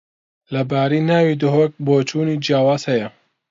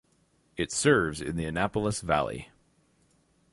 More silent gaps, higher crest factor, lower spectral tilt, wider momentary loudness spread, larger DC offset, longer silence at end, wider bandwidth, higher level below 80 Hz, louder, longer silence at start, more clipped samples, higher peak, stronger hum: neither; second, 14 dB vs 22 dB; first, -7 dB/octave vs -4.5 dB/octave; second, 7 LU vs 11 LU; neither; second, 0.4 s vs 1.05 s; second, 7.8 kHz vs 11.5 kHz; second, -62 dBFS vs -50 dBFS; first, -18 LUFS vs -28 LUFS; about the same, 0.5 s vs 0.55 s; neither; first, -4 dBFS vs -8 dBFS; neither